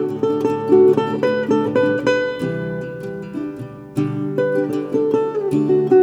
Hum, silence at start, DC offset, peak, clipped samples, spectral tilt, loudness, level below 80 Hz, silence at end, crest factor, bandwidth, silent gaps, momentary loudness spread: none; 0 s; under 0.1%; -2 dBFS; under 0.1%; -7.5 dB/octave; -19 LUFS; -56 dBFS; 0 s; 16 dB; 10.5 kHz; none; 14 LU